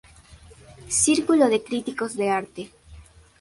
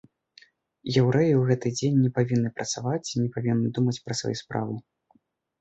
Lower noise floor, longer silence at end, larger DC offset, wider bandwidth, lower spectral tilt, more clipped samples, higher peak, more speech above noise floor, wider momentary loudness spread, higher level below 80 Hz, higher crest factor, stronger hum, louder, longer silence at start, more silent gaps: second, -49 dBFS vs -66 dBFS; second, 0.4 s vs 0.8 s; neither; first, 11.5 kHz vs 8.2 kHz; second, -3 dB/octave vs -6 dB/octave; neither; about the same, -6 dBFS vs -8 dBFS; second, 27 dB vs 42 dB; first, 19 LU vs 10 LU; first, -54 dBFS vs -60 dBFS; about the same, 18 dB vs 18 dB; neither; first, -22 LUFS vs -25 LUFS; second, 0.3 s vs 0.85 s; neither